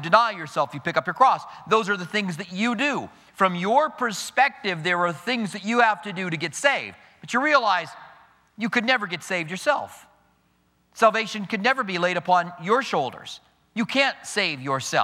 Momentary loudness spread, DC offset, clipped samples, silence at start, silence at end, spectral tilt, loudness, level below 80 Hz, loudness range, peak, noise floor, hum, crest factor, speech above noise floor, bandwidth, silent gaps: 9 LU; under 0.1%; under 0.1%; 0 s; 0 s; -4 dB/octave; -23 LUFS; -72 dBFS; 2 LU; -2 dBFS; -65 dBFS; none; 22 dB; 42 dB; 16 kHz; none